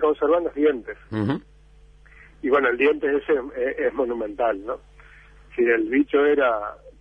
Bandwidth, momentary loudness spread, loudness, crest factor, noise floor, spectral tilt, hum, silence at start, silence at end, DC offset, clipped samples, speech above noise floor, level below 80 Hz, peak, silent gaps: 5.2 kHz; 12 LU; -22 LUFS; 16 dB; -51 dBFS; -8 dB/octave; none; 0 s; 0.1 s; under 0.1%; under 0.1%; 29 dB; -52 dBFS; -6 dBFS; none